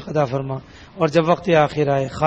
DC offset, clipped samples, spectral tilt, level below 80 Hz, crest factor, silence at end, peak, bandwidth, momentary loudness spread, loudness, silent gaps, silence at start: under 0.1%; under 0.1%; -7 dB/octave; -50 dBFS; 16 dB; 0 s; -4 dBFS; 8.4 kHz; 10 LU; -19 LUFS; none; 0 s